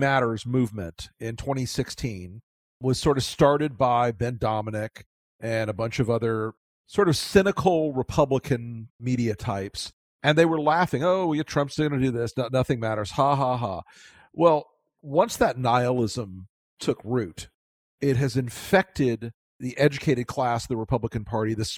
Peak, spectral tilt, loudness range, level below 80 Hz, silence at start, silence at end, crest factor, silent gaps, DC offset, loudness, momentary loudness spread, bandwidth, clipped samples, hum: -4 dBFS; -6 dB/octave; 3 LU; -50 dBFS; 0 s; 0 s; 22 dB; 2.43-2.80 s, 5.06-5.39 s, 6.57-6.84 s, 8.90-8.99 s, 9.93-10.19 s, 16.49-16.77 s, 17.54-17.98 s, 19.34-19.59 s; under 0.1%; -25 LUFS; 14 LU; 16.5 kHz; under 0.1%; none